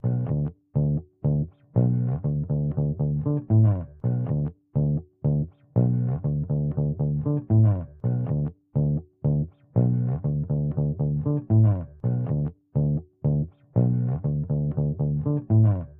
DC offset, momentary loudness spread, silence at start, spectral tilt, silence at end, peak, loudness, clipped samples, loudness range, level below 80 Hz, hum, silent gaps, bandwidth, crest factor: under 0.1%; 7 LU; 0.05 s; -14.5 dB/octave; 0.05 s; -8 dBFS; -25 LUFS; under 0.1%; 1 LU; -42 dBFS; none; none; 1.9 kHz; 16 dB